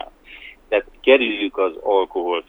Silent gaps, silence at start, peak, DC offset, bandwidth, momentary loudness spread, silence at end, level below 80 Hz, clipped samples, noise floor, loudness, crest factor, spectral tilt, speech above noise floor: none; 0 s; -2 dBFS; under 0.1%; 4.1 kHz; 24 LU; 0.1 s; -52 dBFS; under 0.1%; -42 dBFS; -19 LUFS; 20 dB; -5 dB/octave; 24 dB